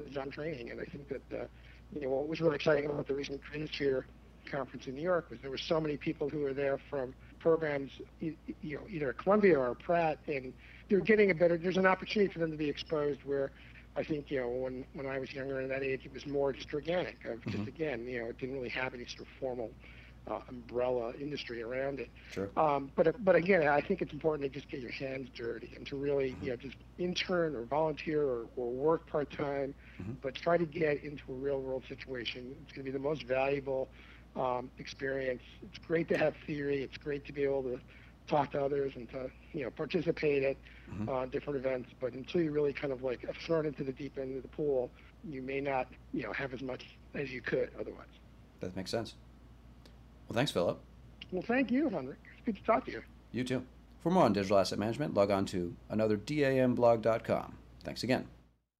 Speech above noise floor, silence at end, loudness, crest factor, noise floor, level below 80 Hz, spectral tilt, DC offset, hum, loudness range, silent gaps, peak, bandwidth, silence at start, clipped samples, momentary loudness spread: 22 dB; 0.45 s; -34 LUFS; 20 dB; -56 dBFS; -58 dBFS; -6.5 dB/octave; under 0.1%; none; 8 LU; none; -16 dBFS; 14 kHz; 0 s; under 0.1%; 14 LU